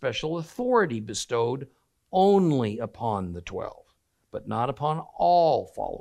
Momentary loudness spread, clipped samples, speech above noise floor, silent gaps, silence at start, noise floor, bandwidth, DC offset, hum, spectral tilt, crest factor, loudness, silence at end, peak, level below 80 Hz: 15 LU; under 0.1%; 39 dB; none; 0 s; -65 dBFS; 13 kHz; under 0.1%; none; -6 dB/octave; 16 dB; -26 LUFS; 0 s; -10 dBFS; -58 dBFS